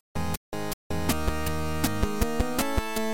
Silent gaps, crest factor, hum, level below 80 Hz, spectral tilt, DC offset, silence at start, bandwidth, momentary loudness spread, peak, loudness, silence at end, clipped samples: 0.37-0.52 s, 0.73-0.90 s; 18 dB; none; -34 dBFS; -4.5 dB/octave; 2%; 0.15 s; 17 kHz; 6 LU; -10 dBFS; -29 LUFS; 0 s; under 0.1%